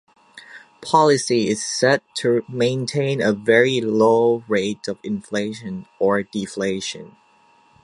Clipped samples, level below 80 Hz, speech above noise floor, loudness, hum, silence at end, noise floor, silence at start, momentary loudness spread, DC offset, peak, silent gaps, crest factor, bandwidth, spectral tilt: under 0.1%; -62 dBFS; 36 dB; -20 LUFS; none; 0.75 s; -56 dBFS; 0.35 s; 13 LU; under 0.1%; -2 dBFS; none; 18 dB; 11.5 kHz; -4.5 dB/octave